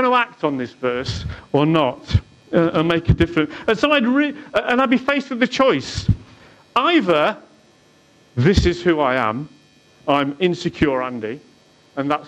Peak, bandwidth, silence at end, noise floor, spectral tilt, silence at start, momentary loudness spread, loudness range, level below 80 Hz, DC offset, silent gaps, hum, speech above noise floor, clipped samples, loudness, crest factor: -4 dBFS; 10 kHz; 0 s; -53 dBFS; -6.5 dB/octave; 0 s; 11 LU; 2 LU; -36 dBFS; under 0.1%; none; none; 35 dB; under 0.1%; -19 LUFS; 16 dB